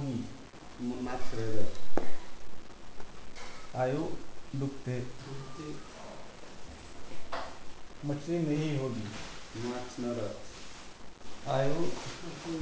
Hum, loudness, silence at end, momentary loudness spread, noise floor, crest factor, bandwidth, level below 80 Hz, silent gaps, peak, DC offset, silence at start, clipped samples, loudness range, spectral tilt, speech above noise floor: none; -37 LUFS; 0 s; 18 LU; -48 dBFS; 18 dB; 8 kHz; -54 dBFS; none; -10 dBFS; 0.4%; 0 s; under 0.1%; 6 LU; -6 dB/octave; 22 dB